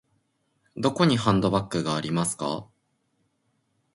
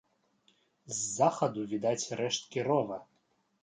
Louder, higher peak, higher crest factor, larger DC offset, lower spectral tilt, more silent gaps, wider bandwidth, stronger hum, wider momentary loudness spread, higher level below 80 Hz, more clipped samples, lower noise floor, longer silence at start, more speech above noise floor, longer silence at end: first, -25 LUFS vs -32 LUFS; first, -6 dBFS vs -12 dBFS; about the same, 20 dB vs 20 dB; neither; first, -5.5 dB/octave vs -4 dB/octave; neither; first, 11.5 kHz vs 9.6 kHz; neither; about the same, 10 LU vs 9 LU; first, -54 dBFS vs -78 dBFS; neither; about the same, -72 dBFS vs -74 dBFS; about the same, 0.75 s vs 0.85 s; first, 48 dB vs 43 dB; first, 1.3 s vs 0.6 s